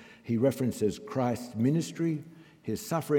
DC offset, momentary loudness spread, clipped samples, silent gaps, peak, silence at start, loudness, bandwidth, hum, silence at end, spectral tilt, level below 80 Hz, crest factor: under 0.1%; 9 LU; under 0.1%; none; -14 dBFS; 0 s; -31 LUFS; 18 kHz; none; 0 s; -7 dB/octave; -68 dBFS; 16 dB